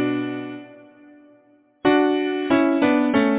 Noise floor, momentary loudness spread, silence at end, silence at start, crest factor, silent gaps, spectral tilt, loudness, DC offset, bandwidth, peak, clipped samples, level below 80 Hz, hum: -56 dBFS; 14 LU; 0 s; 0 s; 18 dB; none; -9.5 dB/octave; -20 LUFS; under 0.1%; 4 kHz; -4 dBFS; under 0.1%; -58 dBFS; none